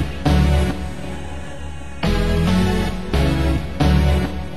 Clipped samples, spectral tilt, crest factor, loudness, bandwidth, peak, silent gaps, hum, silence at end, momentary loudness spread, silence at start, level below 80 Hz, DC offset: under 0.1%; -6.5 dB/octave; 16 dB; -19 LUFS; 12.5 kHz; -4 dBFS; none; none; 0 s; 15 LU; 0 s; -22 dBFS; 3%